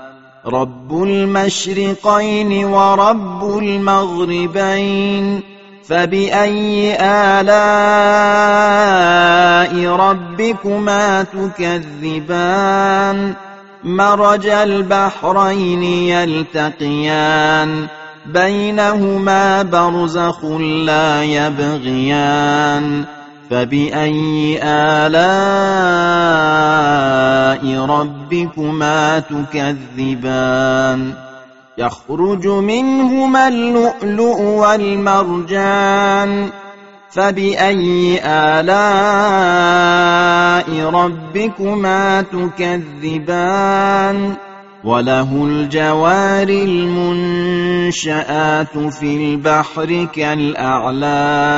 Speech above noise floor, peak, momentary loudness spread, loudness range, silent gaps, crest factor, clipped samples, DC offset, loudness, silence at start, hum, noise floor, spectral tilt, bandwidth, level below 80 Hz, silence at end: 25 dB; 0 dBFS; 9 LU; 5 LU; none; 14 dB; under 0.1%; 0.5%; -14 LUFS; 0 s; none; -38 dBFS; -3.5 dB/octave; 8 kHz; -50 dBFS; 0 s